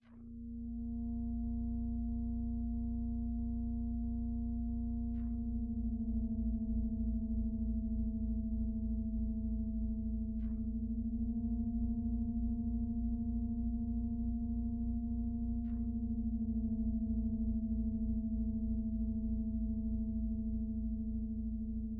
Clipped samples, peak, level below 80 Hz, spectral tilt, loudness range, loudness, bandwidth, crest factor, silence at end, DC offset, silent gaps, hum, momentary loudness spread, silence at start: under 0.1%; -26 dBFS; -40 dBFS; -13 dB/octave; 2 LU; -39 LUFS; 1 kHz; 10 dB; 0 s; under 0.1%; none; none; 2 LU; 0.05 s